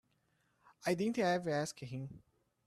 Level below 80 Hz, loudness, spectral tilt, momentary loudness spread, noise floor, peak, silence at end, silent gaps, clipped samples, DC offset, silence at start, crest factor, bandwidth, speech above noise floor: -74 dBFS; -37 LUFS; -5.5 dB/octave; 12 LU; -77 dBFS; -22 dBFS; 0.5 s; none; under 0.1%; under 0.1%; 0.8 s; 18 dB; 14 kHz; 41 dB